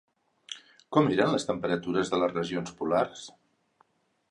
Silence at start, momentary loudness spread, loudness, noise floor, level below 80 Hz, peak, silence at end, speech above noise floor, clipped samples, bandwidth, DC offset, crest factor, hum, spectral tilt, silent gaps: 0.5 s; 18 LU; -28 LUFS; -68 dBFS; -64 dBFS; -8 dBFS; 1 s; 41 dB; under 0.1%; 11 kHz; under 0.1%; 22 dB; none; -5.5 dB/octave; none